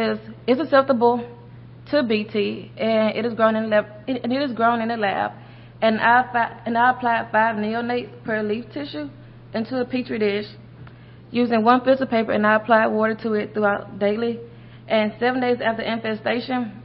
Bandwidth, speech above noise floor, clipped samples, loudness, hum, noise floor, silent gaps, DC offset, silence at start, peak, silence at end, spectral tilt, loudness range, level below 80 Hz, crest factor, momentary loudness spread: 5.6 kHz; 22 dB; under 0.1%; -21 LUFS; none; -43 dBFS; none; under 0.1%; 0 s; -2 dBFS; 0 s; -10.5 dB/octave; 5 LU; -58 dBFS; 18 dB; 11 LU